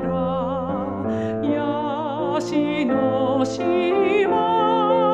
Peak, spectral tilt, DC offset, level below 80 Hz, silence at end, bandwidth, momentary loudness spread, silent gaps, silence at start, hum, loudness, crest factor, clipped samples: -8 dBFS; -6.5 dB/octave; under 0.1%; -52 dBFS; 0 s; 9 kHz; 6 LU; none; 0 s; none; -21 LUFS; 12 dB; under 0.1%